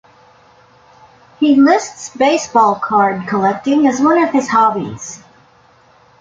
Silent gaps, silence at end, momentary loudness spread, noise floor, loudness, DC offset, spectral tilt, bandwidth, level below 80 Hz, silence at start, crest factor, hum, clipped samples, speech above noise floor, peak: none; 1.05 s; 15 LU; -49 dBFS; -13 LUFS; under 0.1%; -5 dB/octave; 7.8 kHz; -58 dBFS; 1.4 s; 14 dB; none; under 0.1%; 36 dB; -2 dBFS